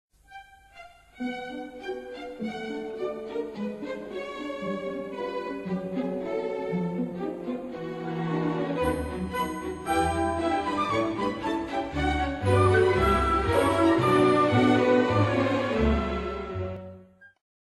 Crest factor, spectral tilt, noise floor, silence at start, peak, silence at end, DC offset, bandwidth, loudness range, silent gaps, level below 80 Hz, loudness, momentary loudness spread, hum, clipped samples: 18 dB; -6.5 dB/octave; -50 dBFS; 0.3 s; -10 dBFS; 0.35 s; under 0.1%; 12 kHz; 12 LU; none; -42 dBFS; -27 LUFS; 14 LU; none; under 0.1%